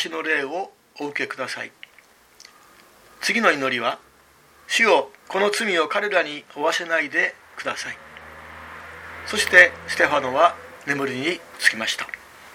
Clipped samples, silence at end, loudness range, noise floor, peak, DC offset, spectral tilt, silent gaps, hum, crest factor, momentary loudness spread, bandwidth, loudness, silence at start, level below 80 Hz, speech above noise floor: under 0.1%; 0 s; 7 LU; -54 dBFS; 0 dBFS; under 0.1%; -2 dB/octave; none; none; 24 dB; 20 LU; 17 kHz; -21 LUFS; 0 s; -62 dBFS; 32 dB